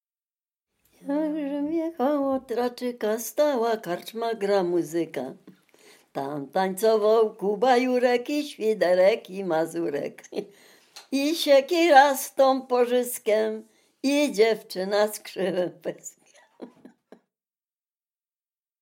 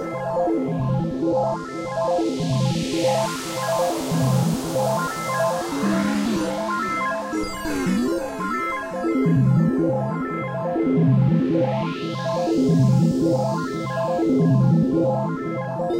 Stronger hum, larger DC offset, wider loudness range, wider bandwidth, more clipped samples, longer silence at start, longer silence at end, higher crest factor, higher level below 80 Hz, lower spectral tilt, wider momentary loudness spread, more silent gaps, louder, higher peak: neither; neither; first, 7 LU vs 3 LU; about the same, 16.5 kHz vs 16 kHz; neither; first, 1.05 s vs 0 s; first, 2.15 s vs 0 s; first, 20 dB vs 12 dB; second, -78 dBFS vs -48 dBFS; second, -4 dB/octave vs -6.5 dB/octave; first, 13 LU vs 8 LU; neither; about the same, -24 LUFS vs -22 LUFS; first, -4 dBFS vs -8 dBFS